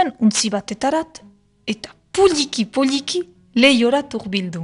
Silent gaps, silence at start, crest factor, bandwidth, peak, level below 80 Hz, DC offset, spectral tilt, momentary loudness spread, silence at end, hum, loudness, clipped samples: none; 0 s; 20 dB; 11 kHz; 0 dBFS; -54 dBFS; under 0.1%; -3.5 dB/octave; 14 LU; 0 s; none; -18 LUFS; under 0.1%